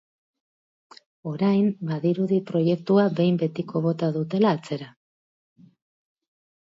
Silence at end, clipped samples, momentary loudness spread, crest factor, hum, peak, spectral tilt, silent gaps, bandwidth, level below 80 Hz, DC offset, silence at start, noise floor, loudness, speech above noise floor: 1.8 s; under 0.1%; 13 LU; 16 dB; none; -8 dBFS; -9 dB/octave; none; 7.8 kHz; -70 dBFS; under 0.1%; 1.25 s; under -90 dBFS; -24 LUFS; over 67 dB